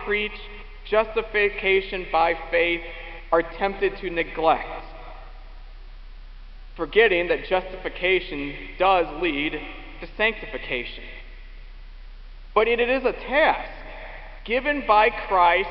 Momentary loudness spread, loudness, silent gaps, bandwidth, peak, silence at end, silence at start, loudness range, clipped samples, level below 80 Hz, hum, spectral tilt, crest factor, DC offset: 20 LU; -23 LUFS; none; 5.8 kHz; -4 dBFS; 0 s; 0 s; 5 LU; under 0.1%; -40 dBFS; none; -7.5 dB/octave; 20 dB; 0.1%